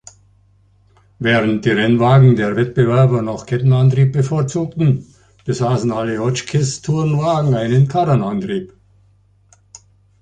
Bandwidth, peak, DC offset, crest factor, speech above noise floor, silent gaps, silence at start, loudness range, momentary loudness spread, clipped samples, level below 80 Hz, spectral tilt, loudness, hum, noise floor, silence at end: 9.2 kHz; -2 dBFS; under 0.1%; 14 dB; 39 dB; none; 1.2 s; 4 LU; 9 LU; under 0.1%; -48 dBFS; -7 dB/octave; -16 LUFS; none; -53 dBFS; 1.55 s